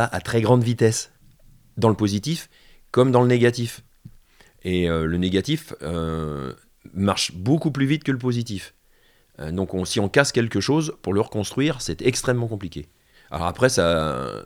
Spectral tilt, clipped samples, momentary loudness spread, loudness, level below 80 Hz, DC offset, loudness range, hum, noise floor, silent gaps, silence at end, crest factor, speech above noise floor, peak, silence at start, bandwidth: -5.5 dB/octave; under 0.1%; 14 LU; -22 LUFS; -46 dBFS; under 0.1%; 3 LU; none; -58 dBFS; none; 0.05 s; 20 dB; 36 dB; -2 dBFS; 0 s; 16 kHz